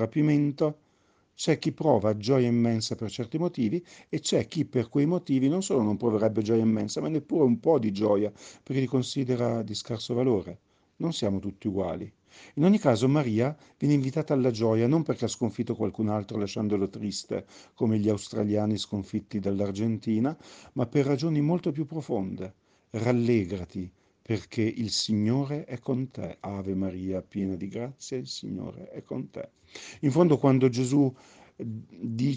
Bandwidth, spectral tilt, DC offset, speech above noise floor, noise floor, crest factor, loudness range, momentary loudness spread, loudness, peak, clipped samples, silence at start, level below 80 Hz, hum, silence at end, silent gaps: 9.8 kHz; -6.5 dB/octave; under 0.1%; 40 dB; -67 dBFS; 20 dB; 5 LU; 13 LU; -28 LUFS; -8 dBFS; under 0.1%; 0 s; -64 dBFS; none; 0 s; none